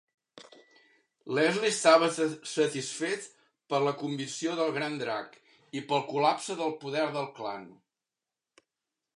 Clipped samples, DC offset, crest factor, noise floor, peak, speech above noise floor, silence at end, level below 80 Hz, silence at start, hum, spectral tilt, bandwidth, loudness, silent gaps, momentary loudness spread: under 0.1%; under 0.1%; 24 dB; -90 dBFS; -6 dBFS; 61 dB; 1.45 s; -84 dBFS; 0.35 s; none; -3.5 dB/octave; 11.5 kHz; -29 LUFS; none; 15 LU